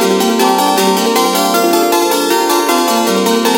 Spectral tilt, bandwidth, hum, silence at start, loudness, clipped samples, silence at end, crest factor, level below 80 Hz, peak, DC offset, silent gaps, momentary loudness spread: -3 dB/octave; 17.5 kHz; none; 0 s; -11 LUFS; under 0.1%; 0 s; 12 dB; -60 dBFS; 0 dBFS; under 0.1%; none; 1 LU